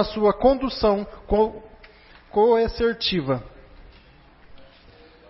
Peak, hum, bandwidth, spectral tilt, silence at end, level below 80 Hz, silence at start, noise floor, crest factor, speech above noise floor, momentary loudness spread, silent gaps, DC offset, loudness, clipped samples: -6 dBFS; none; 5.8 kHz; -9 dB/octave; 0.7 s; -40 dBFS; 0 s; -51 dBFS; 18 dB; 30 dB; 9 LU; none; under 0.1%; -22 LUFS; under 0.1%